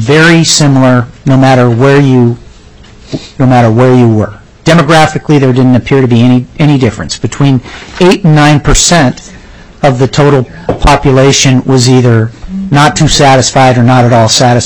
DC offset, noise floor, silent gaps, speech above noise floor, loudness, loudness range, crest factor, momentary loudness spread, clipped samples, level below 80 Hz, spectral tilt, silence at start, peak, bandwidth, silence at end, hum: under 0.1%; -33 dBFS; none; 28 dB; -6 LUFS; 2 LU; 6 dB; 8 LU; 2%; -24 dBFS; -5 dB/octave; 0 s; 0 dBFS; 11 kHz; 0 s; none